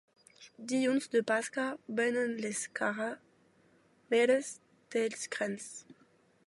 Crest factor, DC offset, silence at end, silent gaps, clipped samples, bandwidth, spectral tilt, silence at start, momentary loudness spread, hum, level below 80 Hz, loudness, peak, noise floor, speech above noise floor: 18 dB; under 0.1%; 0.65 s; none; under 0.1%; 11.5 kHz; -3.5 dB/octave; 0.4 s; 16 LU; none; -86 dBFS; -33 LUFS; -16 dBFS; -67 dBFS; 34 dB